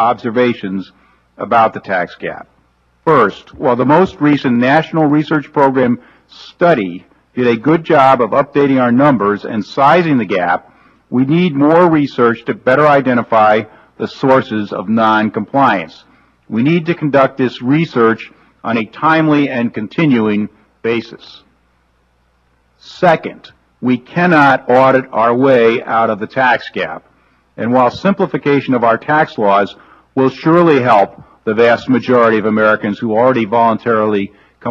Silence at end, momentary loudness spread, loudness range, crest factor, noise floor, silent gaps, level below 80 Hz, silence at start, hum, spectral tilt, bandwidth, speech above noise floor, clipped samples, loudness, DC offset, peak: 0 s; 12 LU; 4 LU; 14 dB; -57 dBFS; none; -54 dBFS; 0 s; none; -8 dB/octave; 7.4 kHz; 44 dB; under 0.1%; -13 LUFS; under 0.1%; 0 dBFS